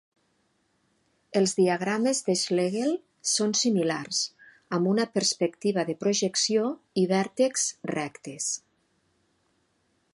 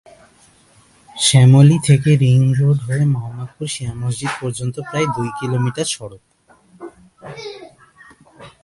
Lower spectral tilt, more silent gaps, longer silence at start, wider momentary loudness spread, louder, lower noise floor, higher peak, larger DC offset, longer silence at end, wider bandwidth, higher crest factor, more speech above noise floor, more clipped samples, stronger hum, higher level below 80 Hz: second, -3.5 dB/octave vs -5.5 dB/octave; neither; first, 1.35 s vs 1.15 s; second, 8 LU vs 22 LU; second, -26 LUFS vs -16 LUFS; first, -71 dBFS vs -51 dBFS; second, -10 dBFS vs 0 dBFS; neither; first, 1.55 s vs 0.15 s; about the same, 11.5 kHz vs 11.5 kHz; about the same, 16 dB vs 18 dB; first, 45 dB vs 36 dB; neither; neither; second, -76 dBFS vs -50 dBFS